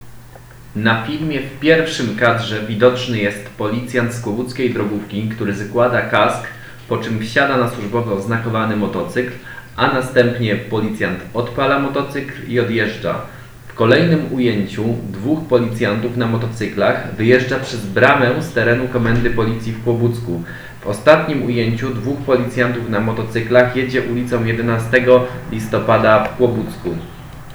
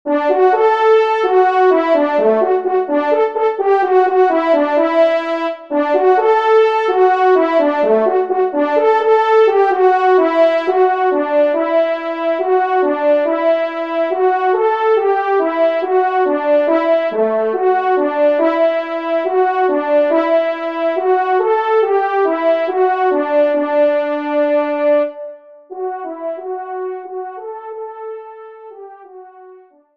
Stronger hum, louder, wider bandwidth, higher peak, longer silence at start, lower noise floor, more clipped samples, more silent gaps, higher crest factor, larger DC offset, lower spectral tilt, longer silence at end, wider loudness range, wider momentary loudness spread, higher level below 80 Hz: neither; second, -17 LUFS vs -14 LUFS; first, over 20 kHz vs 6.2 kHz; about the same, 0 dBFS vs -2 dBFS; about the same, 0 s vs 0.05 s; second, -38 dBFS vs -43 dBFS; neither; neither; about the same, 16 dB vs 12 dB; second, under 0.1% vs 0.2%; about the same, -6.5 dB/octave vs -5.5 dB/octave; second, 0 s vs 0.4 s; second, 3 LU vs 7 LU; about the same, 11 LU vs 12 LU; first, -42 dBFS vs -70 dBFS